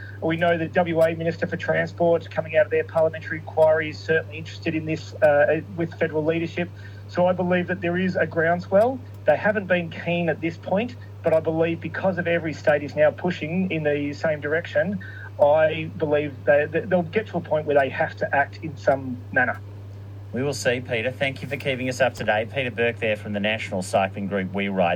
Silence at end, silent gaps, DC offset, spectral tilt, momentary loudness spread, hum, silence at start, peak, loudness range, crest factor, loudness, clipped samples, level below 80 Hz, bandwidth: 0 s; none; under 0.1%; -6.5 dB/octave; 8 LU; none; 0 s; -4 dBFS; 3 LU; 18 dB; -23 LUFS; under 0.1%; -62 dBFS; 14.5 kHz